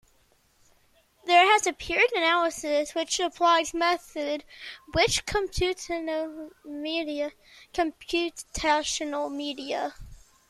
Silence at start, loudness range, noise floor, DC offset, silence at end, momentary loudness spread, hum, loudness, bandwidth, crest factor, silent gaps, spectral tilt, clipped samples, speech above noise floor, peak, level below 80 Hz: 1.25 s; 7 LU; -64 dBFS; under 0.1%; 0.35 s; 14 LU; none; -26 LUFS; 14 kHz; 20 dB; none; -2.5 dB/octave; under 0.1%; 37 dB; -8 dBFS; -48 dBFS